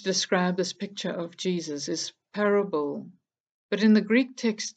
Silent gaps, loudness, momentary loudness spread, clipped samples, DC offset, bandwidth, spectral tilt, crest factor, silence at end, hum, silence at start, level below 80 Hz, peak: 3.40-3.69 s; -26 LUFS; 12 LU; under 0.1%; under 0.1%; 8.8 kHz; -4.5 dB/octave; 18 dB; 0.05 s; none; 0 s; -78 dBFS; -8 dBFS